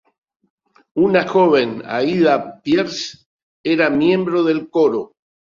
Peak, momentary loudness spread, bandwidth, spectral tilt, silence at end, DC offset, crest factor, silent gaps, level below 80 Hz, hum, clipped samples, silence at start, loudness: -2 dBFS; 12 LU; 7.4 kHz; -6 dB/octave; 0.45 s; under 0.1%; 16 dB; 3.26-3.64 s; -60 dBFS; none; under 0.1%; 0.95 s; -17 LUFS